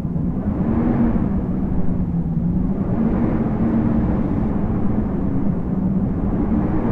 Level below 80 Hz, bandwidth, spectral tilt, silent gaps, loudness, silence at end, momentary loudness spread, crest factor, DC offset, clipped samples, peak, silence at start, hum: -28 dBFS; 3.6 kHz; -12 dB/octave; none; -20 LUFS; 0 s; 3 LU; 12 dB; under 0.1%; under 0.1%; -6 dBFS; 0 s; none